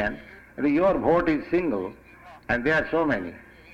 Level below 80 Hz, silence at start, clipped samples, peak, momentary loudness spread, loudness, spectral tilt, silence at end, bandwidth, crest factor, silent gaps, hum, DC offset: -48 dBFS; 0 s; under 0.1%; -8 dBFS; 17 LU; -24 LUFS; -7.5 dB/octave; 0 s; 7.6 kHz; 16 dB; none; none; under 0.1%